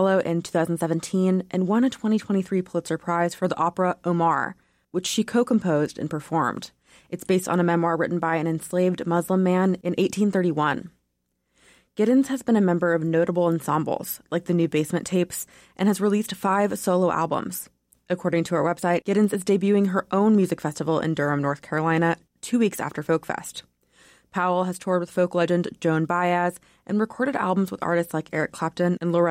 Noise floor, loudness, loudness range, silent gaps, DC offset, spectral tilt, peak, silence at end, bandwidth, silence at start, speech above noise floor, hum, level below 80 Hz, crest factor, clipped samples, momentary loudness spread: -75 dBFS; -24 LUFS; 3 LU; none; under 0.1%; -6 dB/octave; -10 dBFS; 0 s; 16.5 kHz; 0 s; 52 dB; none; -64 dBFS; 12 dB; under 0.1%; 7 LU